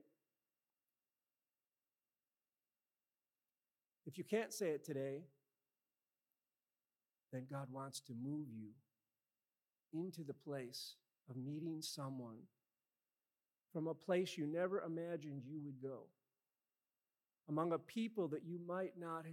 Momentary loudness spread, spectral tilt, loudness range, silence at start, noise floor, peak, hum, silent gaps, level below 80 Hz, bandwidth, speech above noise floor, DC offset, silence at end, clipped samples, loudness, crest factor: 12 LU; -5.5 dB/octave; 7 LU; 4.05 s; under -90 dBFS; -26 dBFS; none; none; under -90 dBFS; 16 kHz; over 45 dB; under 0.1%; 0 s; under 0.1%; -46 LUFS; 22 dB